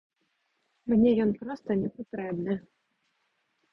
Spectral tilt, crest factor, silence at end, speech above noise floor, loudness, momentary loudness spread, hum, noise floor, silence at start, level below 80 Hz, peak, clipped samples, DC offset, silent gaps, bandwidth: -10 dB/octave; 18 dB; 1.15 s; 49 dB; -28 LUFS; 13 LU; none; -76 dBFS; 0.85 s; -62 dBFS; -12 dBFS; under 0.1%; under 0.1%; none; 5.8 kHz